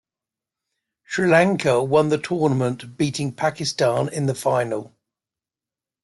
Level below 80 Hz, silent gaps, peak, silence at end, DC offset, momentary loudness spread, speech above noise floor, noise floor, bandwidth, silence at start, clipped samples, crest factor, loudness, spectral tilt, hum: -64 dBFS; none; -4 dBFS; 1.15 s; under 0.1%; 9 LU; 69 dB; -90 dBFS; 12 kHz; 1.1 s; under 0.1%; 18 dB; -21 LUFS; -5.5 dB/octave; none